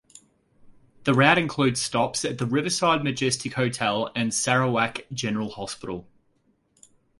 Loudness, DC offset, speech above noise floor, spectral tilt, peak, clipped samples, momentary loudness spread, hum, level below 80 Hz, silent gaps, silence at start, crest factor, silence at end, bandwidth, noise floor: -24 LUFS; under 0.1%; 43 dB; -4 dB/octave; -2 dBFS; under 0.1%; 12 LU; none; -60 dBFS; none; 0.65 s; 24 dB; 1.15 s; 11.5 kHz; -67 dBFS